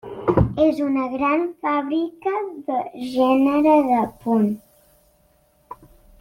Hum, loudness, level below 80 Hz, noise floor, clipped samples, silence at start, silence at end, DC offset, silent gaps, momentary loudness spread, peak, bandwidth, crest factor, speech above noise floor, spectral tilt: none; -20 LUFS; -42 dBFS; -60 dBFS; under 0.1%; 0.05 s; 0.45 s; under 0.1%; none; 10 LU; -4 dBFS; 16 kHz; 18 dB; 40 dB; -8.5 dB/octave